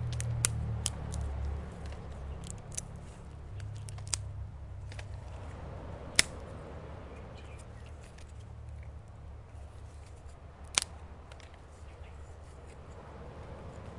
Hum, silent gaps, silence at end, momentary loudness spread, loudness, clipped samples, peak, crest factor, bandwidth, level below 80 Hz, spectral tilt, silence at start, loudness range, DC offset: none; none; 0 s; 19 LU; -38 LUFS; under 0.1%; 0 dBFS; 40 dB; 11.5 kHz; -46 dBFS; -2.5 dB/octave; 0 s; 12 LU; under 0.1%